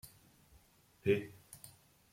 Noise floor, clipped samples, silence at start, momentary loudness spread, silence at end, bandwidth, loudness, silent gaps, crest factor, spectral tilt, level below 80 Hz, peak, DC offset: -67 dBFS; under 0.1%; 0.05 s; 22 LU; 0.45 s; 16.5 kHz; -36 LUFS; none; 24 dB; -6 dB/octave; -72 dBFS; -18 dBFS; under 0.1%